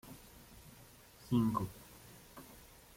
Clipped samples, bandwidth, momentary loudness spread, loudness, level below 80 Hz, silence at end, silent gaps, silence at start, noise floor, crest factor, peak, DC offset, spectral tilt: under 0.1%; 16.5 kHz; 23 LU; -36 LUFS; -62 dBFS; 0.4 s; none; 0.05 s; -59 dBFS; 20 dB; -20 dBFS; under 0.1%; -7 dB/octave